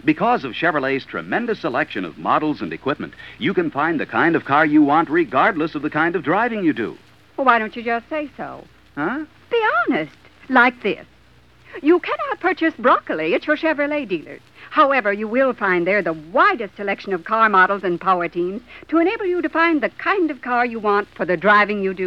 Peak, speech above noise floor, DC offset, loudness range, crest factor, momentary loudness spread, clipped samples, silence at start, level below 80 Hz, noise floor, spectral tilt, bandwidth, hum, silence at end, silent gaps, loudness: 0 dBFS; 33 dB; 0.2%; 4 LU; 18 dB; 11 LU; under 0.1%; 0.05 s; -58 dBFS; -52 dBFS; -7 dB/octave; 6.4 kHz; none; 0 s; none; -19 LUFS